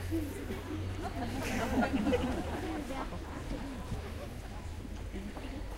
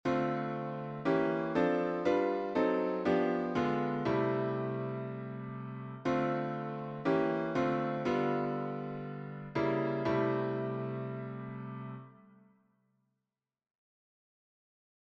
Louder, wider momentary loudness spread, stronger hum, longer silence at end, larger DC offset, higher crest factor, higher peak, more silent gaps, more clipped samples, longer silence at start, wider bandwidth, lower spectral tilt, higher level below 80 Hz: second, -37 LUFS vs -34 LUFS; about the same, 12 LU vs 11 LU; neither; second, 0 s vs 2.95 s; neither; about the same, 18 dB vs 18 dB; about the same, -18 dBFS vs -16 dBFS; neither; neither; about the same, 0 s vs 0.05 s; first, 16 kHz vs 7.8 kHz; second, -6 dB/octave vs -8 dB/octave; first, -44 dBFS vs -68 dBFS